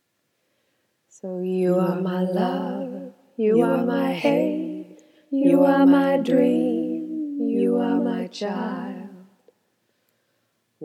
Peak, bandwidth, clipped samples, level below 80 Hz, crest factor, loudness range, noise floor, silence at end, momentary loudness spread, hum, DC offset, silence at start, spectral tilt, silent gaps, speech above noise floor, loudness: -6 dBFS; 12.5 kHz; under 0.1%; -86 dBFS; 18 dB; 7 LU; -72 dBFS; 0 s; 17 LU; none; under 0.1%; 1.25 s; -8 dB/octave; none; 52 dB; -22 LUFS